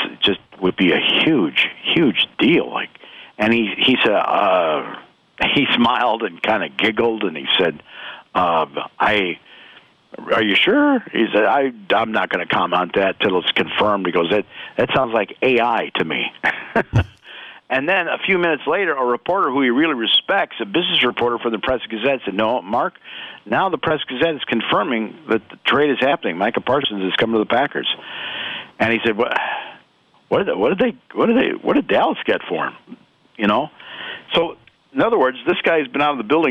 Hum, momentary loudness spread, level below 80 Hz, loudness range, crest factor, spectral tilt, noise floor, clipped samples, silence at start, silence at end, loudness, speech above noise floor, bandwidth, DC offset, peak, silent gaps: none; 10 LU; -50 dBFS; 4 LU; 12 dB; -6.5 dB/octave; -56 dBFS; under 0.1%; 0 s; 0 s; -18 LUFS; 38 dB; 8.8 kHz; under 0.1%; -6 dBFS; none